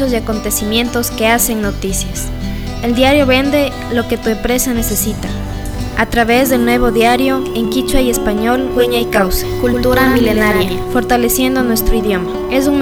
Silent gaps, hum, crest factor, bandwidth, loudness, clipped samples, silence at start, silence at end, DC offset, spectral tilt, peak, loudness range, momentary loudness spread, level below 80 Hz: none; none; 14 dB; over 20 kHz; -14 LUFS; under 0.1%; 0 s; 0 s; under 0.1%; -4 dB/octave; 0 dBFS; 2 LU; 7 LU; -24 dBFS